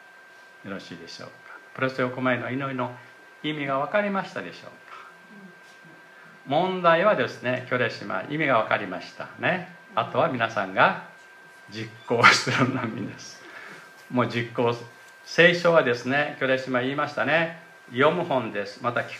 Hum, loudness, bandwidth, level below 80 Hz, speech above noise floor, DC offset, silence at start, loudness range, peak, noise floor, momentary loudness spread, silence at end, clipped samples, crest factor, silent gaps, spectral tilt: none; -24 LUFS; 14 kHz; -74 dBFS; 25 dB; under 0.1%; 0.65 s; 8 LU; -2 dBFS; -50 dBFS; 22 LU; 0 s; under 0.1%; 24 dB; none; -5 dB/octave